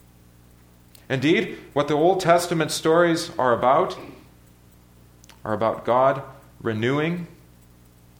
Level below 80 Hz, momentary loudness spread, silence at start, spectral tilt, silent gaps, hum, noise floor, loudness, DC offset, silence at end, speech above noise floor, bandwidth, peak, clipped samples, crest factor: -56 dBFS; 14 LU; 1.1 s; -5 dB/octave; none; 60 Hz at -55 dBFS; -52 dBFS; -22 LUFS; under 0.1%; 0.9 s; 31 dB; 19 kHz; -4 dBFS; under 0.1%; 20 dB